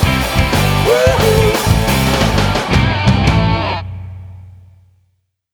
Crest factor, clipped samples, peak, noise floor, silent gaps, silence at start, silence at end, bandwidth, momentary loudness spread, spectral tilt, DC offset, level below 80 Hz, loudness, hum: 14 dB; under 0.1%; 0 dBFS; -63 dBFS; none; 0 s; 1.05 s; over 20 kHz; 11 LU; -5 dB/octave; under 0.1%; -24 dBFS; -13 LUFS; none